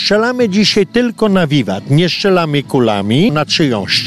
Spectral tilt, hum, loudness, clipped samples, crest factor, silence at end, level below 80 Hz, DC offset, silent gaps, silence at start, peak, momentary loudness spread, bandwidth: -5.5 dB/octave; none; -12 LUFS; under 0.1%; 10 dB; 0 s; -46 dBFS; under 0.1%; none; 0 s; -2 dBFS; 3 LU; 13.5 kHz